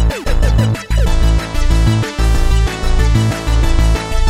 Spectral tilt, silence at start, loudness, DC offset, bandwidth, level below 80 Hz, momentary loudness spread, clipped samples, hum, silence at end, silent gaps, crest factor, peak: -5.5 dB/octave; 0 s; -15 LUFS; under 0.1%; 14 kHz; -12 dBFS; 3 LU; under 0.1%; none; 0 s; none; 12 dB; 0 dBFS